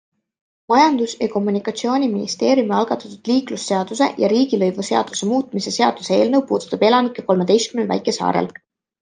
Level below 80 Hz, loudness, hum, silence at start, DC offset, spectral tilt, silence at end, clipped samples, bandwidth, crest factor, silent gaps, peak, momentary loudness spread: -66 dBFS; -18 LUFS; none; 0.7 s; under 0.1%; -4.5 dB/octave; 0.5 s; under 0.1%; 9.8 kHz; 16 dB; none; -2 dBFS; 6 LU